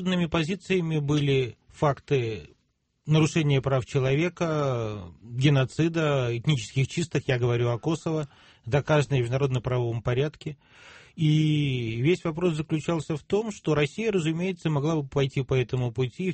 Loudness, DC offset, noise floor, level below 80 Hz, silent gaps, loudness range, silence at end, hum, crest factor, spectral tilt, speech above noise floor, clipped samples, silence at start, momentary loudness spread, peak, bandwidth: -26 LUFS; under 0.1%; -72 dBFS; -52 dBFS; none; 1 LU; 0 s; none; 16 dB; -6.5 dB/octave; 47 dB; under 0.1%; 0 s; 8 LU; -10 dBFS; 8.8 kHz